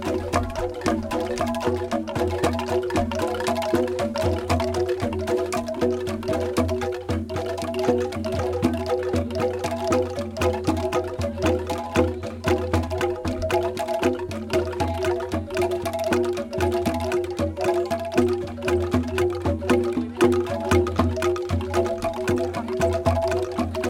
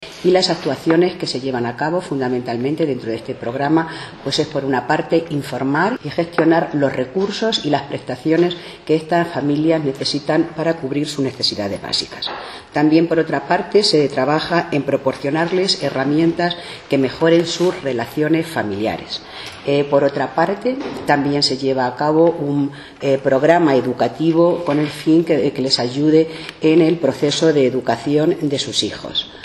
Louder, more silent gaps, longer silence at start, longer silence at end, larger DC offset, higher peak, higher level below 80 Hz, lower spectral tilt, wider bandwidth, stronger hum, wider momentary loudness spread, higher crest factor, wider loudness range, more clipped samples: second, -24 LUFS vs -18 LUFS; neither; about the same, 0 s vs 0 s; about the same, 0 s vs 0 s; neither; second, -4 dBFS vs 0 dBFS; first, -44 dBFS vs -54 dBFS; about the same, -6 dB/octave vs -5.5 dB/octave; first, 17 kHz vs 12.5 kHz; neither; second, 5 LU vs 8 LU; about the same, 18 dB vs 16 dB; about the same, 2 LU vs 4 LU; neither